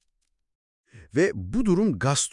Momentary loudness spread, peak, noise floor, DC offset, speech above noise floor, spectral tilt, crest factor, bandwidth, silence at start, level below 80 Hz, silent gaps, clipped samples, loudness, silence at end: 4 LU; -8 dBFS; -76 dBFS; under 0.1%; 53 dB; -5 dB/octave; 18 dB; 12 kHz; 0.95 s; -46 dBFS; none; under 0.1%; -24 LUFS; 0.05 s